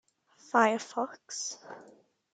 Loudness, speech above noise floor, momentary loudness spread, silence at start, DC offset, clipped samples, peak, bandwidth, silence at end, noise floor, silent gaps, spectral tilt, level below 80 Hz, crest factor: -30 LUFS; 30 dB; 22 LU; 0.55 s; under 0.1%; under 0.1%; -10 dBFS; 9.4 kHz; 0.5 s; -61 dBFS; none; -2.5 dB/octave; -86 dBFS; 24 dB